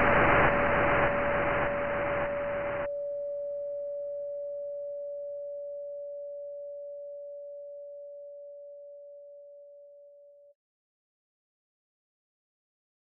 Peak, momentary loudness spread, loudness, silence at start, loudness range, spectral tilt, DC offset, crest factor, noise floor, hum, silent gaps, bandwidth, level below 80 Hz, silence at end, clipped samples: -12 dBFS; 22 LU; -30 LUFS; 0 s; 21 LU; -4 dB/octave; under 0.1%; 22 dB; -55 dBFS; none; none; 3.3 kHz; -50 dBFS; 2.6 s; under 0.1%